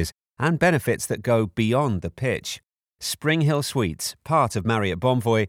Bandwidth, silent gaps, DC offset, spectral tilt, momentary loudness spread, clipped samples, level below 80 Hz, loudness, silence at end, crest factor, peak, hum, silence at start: 19.5 kHz; 2.73-2.77 s; under 0.1%; -5.5 dB/octave; 9 LU; under 0.1%; -48 dBFS; -23 LUFS; 0 s; 16 dB; -8 dBFS; none; 0 s